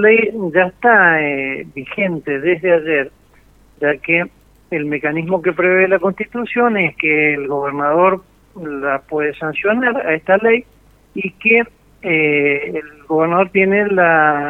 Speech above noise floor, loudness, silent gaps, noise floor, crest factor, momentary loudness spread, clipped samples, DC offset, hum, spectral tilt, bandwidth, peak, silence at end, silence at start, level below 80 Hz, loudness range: 33 dB; -15 LUFS; none; -49 dBFS; 16 dB; 13 LU; under 0.1%; under 0.1%; none; -8 dB/octave; 4 kHz; 0 dBFS; 0 s; 0 s; -54 dBFS; 3 LU